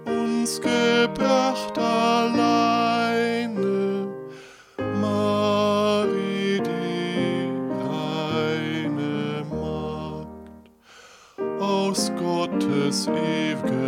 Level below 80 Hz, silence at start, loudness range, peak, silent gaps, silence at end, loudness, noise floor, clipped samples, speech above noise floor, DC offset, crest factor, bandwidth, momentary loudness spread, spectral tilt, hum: -56 dBFS; 0 s; 7 LU; -8 dBFS; none; 0 s; -23 LUFS; -50 dBFS; under 0.1%; 28 dB; under 0.1%; 16 dB; 16 kHz; 10 LU; -5 dB/octave; none